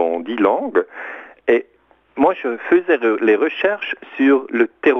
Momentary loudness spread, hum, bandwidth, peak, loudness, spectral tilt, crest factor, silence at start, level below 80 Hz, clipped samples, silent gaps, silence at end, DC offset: 10 LU; none; 5.8 kHz; 0 dBFS; -18 LUFS; -6.5 dB/octave; 18 dB; 0 s; -62 dBFS; under 0.1%; none; 0 s; under 0.1%